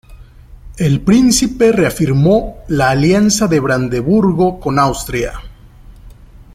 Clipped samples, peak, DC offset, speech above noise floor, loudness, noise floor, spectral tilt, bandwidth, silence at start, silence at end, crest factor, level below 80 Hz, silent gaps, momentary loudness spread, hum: under 0.1%; 0 dBFS; under 0.1%; 26 dB; -13 LUFS; -38 dBFS; -5.5 dB/octave; 16 kHz; 0.1 s; 0.1 s; 14 dB; -34 dBFS; none; 9 LU; none